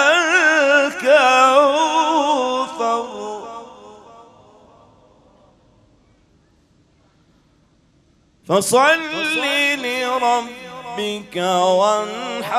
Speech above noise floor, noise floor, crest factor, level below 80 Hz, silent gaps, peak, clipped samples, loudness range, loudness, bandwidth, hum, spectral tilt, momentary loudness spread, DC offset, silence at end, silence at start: 39 dB; -57 dBFS; 18 dB; -64 dBFS; none; 0 dBFS; under 0.1%; 14 LU; -16 LUFS; 15.5 kHz; none; -2.5 dB/octave; 16 LU; under 0.1%; 0 s; 0 s